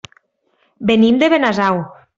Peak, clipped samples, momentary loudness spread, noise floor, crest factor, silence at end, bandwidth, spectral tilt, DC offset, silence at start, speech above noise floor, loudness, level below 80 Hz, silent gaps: -2 dBFS; under 0.1%; 10 LU; -63 dBFS; 14 dB; 0.25 s; 7.6 kHz; -6 dB/octave; under 0.1%; 0.8 s; 49 dB; -14 LUFS; -54 dBFS; none